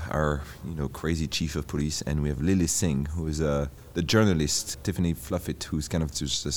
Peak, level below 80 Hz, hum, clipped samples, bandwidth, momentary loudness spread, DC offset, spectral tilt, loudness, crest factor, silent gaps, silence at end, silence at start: -8 dBFS; -40 dBFS; none; under 0.1%; over 20 kHz; 8 LU; 0.2%; -4.5 dB/octave; -28 LUFS; 20 dB; none; 0 s; 0 s